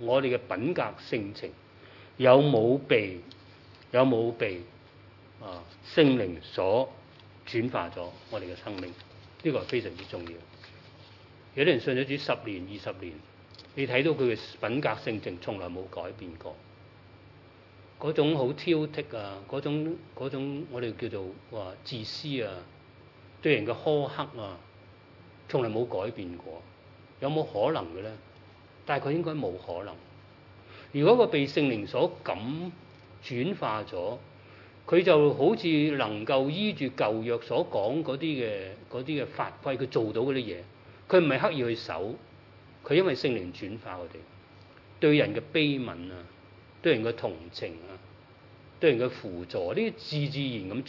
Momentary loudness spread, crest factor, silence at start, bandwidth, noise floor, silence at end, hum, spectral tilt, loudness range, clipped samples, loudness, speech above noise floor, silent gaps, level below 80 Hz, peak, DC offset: 19 LU; 24 dB; 0 s; 6 kHz; -54 dBFS; 0 s; none; -7.5 dB/octave; 8 LU; under 0.1%; -29 LUFS; 25 dB; none; -70 dBFS; -6 dBFS; under 0.1%